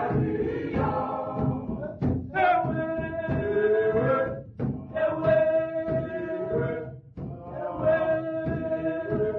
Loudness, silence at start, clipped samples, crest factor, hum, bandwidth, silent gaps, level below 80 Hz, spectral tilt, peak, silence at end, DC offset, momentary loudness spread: -27 LUFS; 0 s; under 0.1%; 14 dB; none; 5 kHz; none; -48 dBFS; -10 dB/octave; -12 dBFS; 0 s; under 0.1%; 10 LU